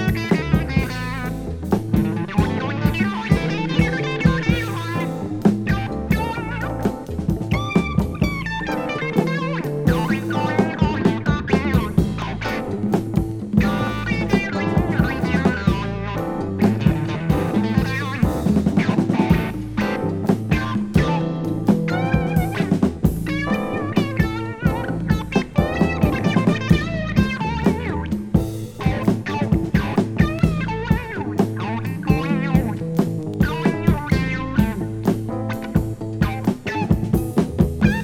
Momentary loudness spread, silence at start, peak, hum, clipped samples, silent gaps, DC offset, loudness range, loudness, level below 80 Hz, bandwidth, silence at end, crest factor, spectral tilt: 6 LU; 0 s; -2 dBFS; none; under 0.1%; none; under 0.1%; 2 LU; -21 LUFS; -32 dBFS; 16.5 kHz; 0 s; 18 dB; -7.5 dB/octave